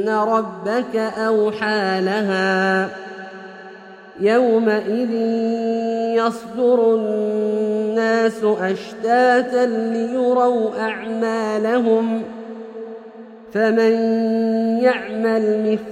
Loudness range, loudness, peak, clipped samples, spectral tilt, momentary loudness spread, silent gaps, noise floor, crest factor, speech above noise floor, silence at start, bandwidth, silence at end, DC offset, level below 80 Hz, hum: 2 LU; -19 LUFS; -4 dBFS; under 0.1%; -6 dB/octave; 16 LU; none; -39 dBFS; 16 dB; 21 dB; 0 s; 10 kHz; 0 s; under 0.1%; -66 dBFS; none